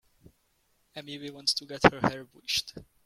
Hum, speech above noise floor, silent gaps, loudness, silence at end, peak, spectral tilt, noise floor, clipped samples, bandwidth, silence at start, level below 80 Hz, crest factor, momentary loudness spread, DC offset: none; 42 dB; none; -27 LUFS; 0.25 s; -2 dBFS; -3.5 dB/octave; -71 dBFS; under 0.1%; 16.5 kHz; 0.95 s; -56 dBFS; 30 dB; 21 LU; under 0.1%